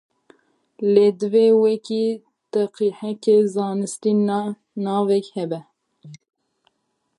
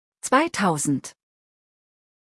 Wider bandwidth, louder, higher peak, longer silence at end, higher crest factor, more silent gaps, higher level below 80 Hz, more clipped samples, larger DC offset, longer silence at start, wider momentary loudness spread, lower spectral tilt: about the same, 11.5 kHz vs 12 kHz; about the same, -20 LUFS vs -22 LUFS; about the same, -4 dBFS vs -6 dBFS; second, 1 s vs 1.2 s; about the same, 18 dB vs 20 dB; neither; second, -76 dBFS vs -68 dBFS; neither; neither; first, 0.8 s vs 0.25 s; first, 12 LU vs 9 LU; first, -6.5 dB/octave vs -4 dB/octave